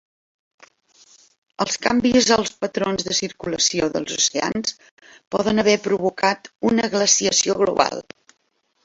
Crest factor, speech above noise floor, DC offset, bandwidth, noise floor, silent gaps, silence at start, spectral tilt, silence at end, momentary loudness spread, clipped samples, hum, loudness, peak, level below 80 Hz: 20 dB; 48 dB; under 0.1%; 8.2 kHz; -68 dBFS; 4.91-4.97 s, 5.27-5.31 s; 1.6 s; -2.5 dB/octave; 0.85 s; 9 LU; under 0.1%; none; -20 LUFS; 0 dBFS; -54 dBFS